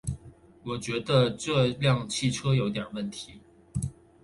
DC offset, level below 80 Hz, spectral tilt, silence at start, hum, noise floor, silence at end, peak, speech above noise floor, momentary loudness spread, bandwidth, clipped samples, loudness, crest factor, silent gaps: under 0.1%; -50 dBFS; -5.5 dB/octave; 0.05 s; none; -52 dBFS; 0.3 s; -10 dBFS; 25 dB; 15 LU; 11.5 kHz; under 0.1%; -28 LUFS; 18 dB; none